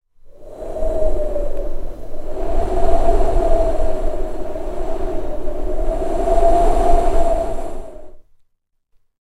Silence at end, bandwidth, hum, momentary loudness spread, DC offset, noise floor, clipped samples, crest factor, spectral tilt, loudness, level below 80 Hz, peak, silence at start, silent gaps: 1.05 s; 9 kHz; none; 15 LU; under 0.1%; -65 dBFS; under 0.1%; 14 dB; -7 dB/octave; -21 LUFS; -20 dBFS; 0 dBFS; 0.25 s; none